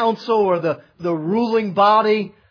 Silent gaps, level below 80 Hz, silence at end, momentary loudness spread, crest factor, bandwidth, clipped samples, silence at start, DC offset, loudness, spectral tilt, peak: none; -66 dBFS; 0.2 s; 10 LU; 14 dB; 5.4 kHz; under 0.1%; 0 s; under 0.1%; -18 LUFS; -7.5 dB/octave; -4 dBFS